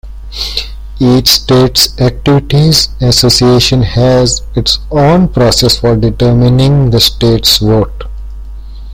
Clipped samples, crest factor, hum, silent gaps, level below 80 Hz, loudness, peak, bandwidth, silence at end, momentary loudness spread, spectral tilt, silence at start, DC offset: 0.2%; 8 dB; none; none; -22 dBFS; -8 LUFS; 0 dBFS; over 20 kHz; 0 s; 12 LU; -5 dB/octave; 0.05 s; under 0.1%